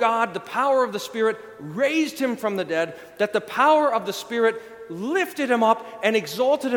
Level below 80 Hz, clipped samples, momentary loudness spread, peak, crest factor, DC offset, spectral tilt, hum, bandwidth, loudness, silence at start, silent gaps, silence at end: -70 dBFS; under 0.1%; 8 LU; -4 dBFS; 18 dB; under 0.1%; -4 dB/octave; none; 19 kHz; -23 LUFS; 0 s; none; 0 s